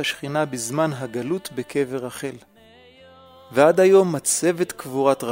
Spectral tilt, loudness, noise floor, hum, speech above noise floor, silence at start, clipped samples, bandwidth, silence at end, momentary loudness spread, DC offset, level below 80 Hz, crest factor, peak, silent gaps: -4.5 dB/octave; -21 LUFS; -50 dBFS; none; 29 dB; 0 s; under 0.1%; 16 kHz; 0 s; 13 LU; under 0.1%; -64 dBFS; 20 dB; -2 dBFS; none